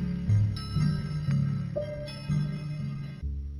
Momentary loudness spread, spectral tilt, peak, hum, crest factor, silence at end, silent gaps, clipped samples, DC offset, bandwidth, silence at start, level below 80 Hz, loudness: 10 LU; -8 dB/octave; -16 dBFS; none; 14 dB; 0 s; none; under 0.1%; under 0.1%; 11 kHz; 0 s; -42 dBFS; -30 LUFS